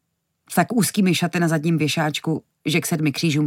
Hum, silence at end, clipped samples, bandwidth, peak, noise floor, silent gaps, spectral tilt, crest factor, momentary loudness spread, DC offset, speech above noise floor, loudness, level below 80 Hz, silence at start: none; 0 s; under 0.1%; 17 kHz; -6 dBFS; -62 dBFS; none; -5 dB/octave; 16 dB; 6 LU; under 0.1%; 42 dB; -21 LUFS; -68 dBFS; 0.5 s